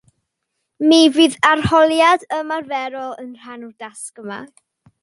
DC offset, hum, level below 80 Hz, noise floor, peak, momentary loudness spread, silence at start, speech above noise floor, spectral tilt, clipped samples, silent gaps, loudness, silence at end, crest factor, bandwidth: under 0.1%; none; -48 dBFS; -76 dBFS; 0 dBFS; 21 LU; 0.8 s; 59 dB; -4 dB/octave; under 0.1%; none; -15 LUFS; 0.55 s; 16 dB; 11.5 kHz